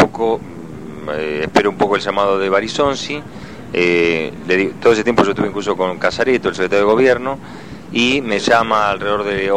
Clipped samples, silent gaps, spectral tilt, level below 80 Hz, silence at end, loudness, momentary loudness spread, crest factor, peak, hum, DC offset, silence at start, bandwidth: under 0.1%; none; -5 dB/octave; -46 dBFS; 0 s; -16 LUFS; 13 LU; 16 dB; 0 dBFS; none; 0.9%; 0 s; 11.5 kHz